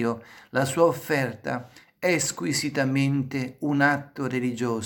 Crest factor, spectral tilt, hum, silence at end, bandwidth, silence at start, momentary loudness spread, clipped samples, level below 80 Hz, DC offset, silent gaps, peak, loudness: 20 dB; -5 dB/octave; none; 0 s; 17.5 kHz; 0 s; 8 LU; under 0.1%; -66 dBFS; under 0.1%; none; -6 dBFS; -25 LUFS